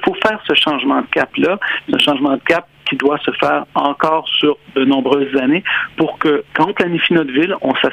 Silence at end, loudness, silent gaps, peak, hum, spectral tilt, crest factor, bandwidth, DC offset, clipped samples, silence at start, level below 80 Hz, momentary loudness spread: 0 s; -15 LUFS; none; 0 dBFS; none; -5.5 dB/octave; 16 dB; 10.5 kHz; under 0.1%; under 0.1%; 0 s; -54 dBFS; 4 LU